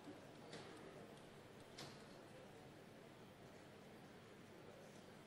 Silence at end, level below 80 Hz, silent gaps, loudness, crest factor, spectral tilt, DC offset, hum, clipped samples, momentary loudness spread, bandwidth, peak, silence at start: 0 s; -82 dBFS; none; -60 LUFS; 18 dB; -4.5 dB/octave; under 0.1%; none; under 0.1%; 5 LU; 16 kHz; -42 dBFS; 0 s